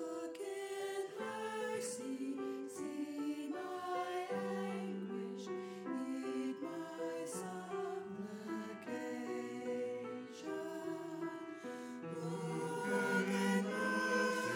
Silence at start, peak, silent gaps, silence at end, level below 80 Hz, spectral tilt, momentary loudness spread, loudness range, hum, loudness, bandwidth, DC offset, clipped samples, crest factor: 0 s; -24 dBFS; none; 0 s; -88 dBFS; -5 dB/octave; 10 LU; 5 LU; none; -41 LUFS; 17.5 kHz; under 0.1%; under 0.1%; 18 dB